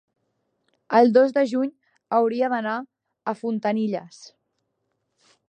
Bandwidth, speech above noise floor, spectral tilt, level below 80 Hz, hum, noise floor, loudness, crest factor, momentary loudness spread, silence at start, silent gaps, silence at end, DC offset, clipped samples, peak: 9.2 kHz; 54 dB; -6.5 dB/octave; -80 dBFS; none; -76 dBFS; -22 LUFS; 20 dB; 15 LU; 0.9 s; none; 1.25 s; under 0.1%; under 0.1%; -4 dBFS